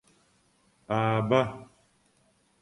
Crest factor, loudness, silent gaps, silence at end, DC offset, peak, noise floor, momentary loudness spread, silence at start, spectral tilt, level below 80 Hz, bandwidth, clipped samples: 22 dB; -27 LUFS; none; 1 s; under 0.1%; -10 dBFS; -67 dBFS; 11 LU; 0.9 s; -7.5 dB/octave; -64 dBFS; 11 kHz; under 0.1%